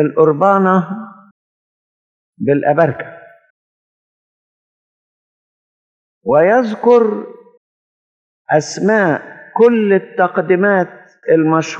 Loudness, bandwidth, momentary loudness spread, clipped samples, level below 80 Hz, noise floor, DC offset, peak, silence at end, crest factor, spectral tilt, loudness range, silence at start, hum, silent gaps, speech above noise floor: -13 LUFS; 8.2 kHz; 15 LU; under 0.1%; -68 dBFS; under -90 dBFS; under 0.1%; 0 dBFS; 0 s; 16 dB; -6.5 dB/octave; 6 LU; 0 s; none; 1.31-2.33 s, 3.50-6.21 s, 7.57-8.45 s; over 77 dB